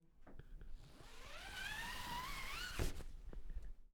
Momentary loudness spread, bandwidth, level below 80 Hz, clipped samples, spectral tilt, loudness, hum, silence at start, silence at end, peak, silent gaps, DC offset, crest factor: 16 LU; 20 kHz; -50 dBFS; under 0.1%; -3 dB/octave; -48 LUFS; none; 0.05 s; 0 s; -26 dBFS; none; under 0.1%; 22 dB